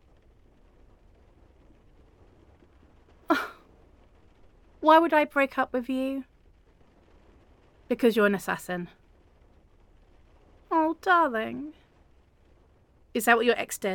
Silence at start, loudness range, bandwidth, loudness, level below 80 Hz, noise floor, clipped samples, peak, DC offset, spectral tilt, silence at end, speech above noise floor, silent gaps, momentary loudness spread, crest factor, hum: 3.3 s; 11 LU; 17.5 kHz; -25 LUFS; -60 dBFS; -60 dBFS; under 0.1%; -6 dBFS; under 0.1%; -4.5 dB/octave; 0 s; 36 dB; none; 15 LU; 24 dB; none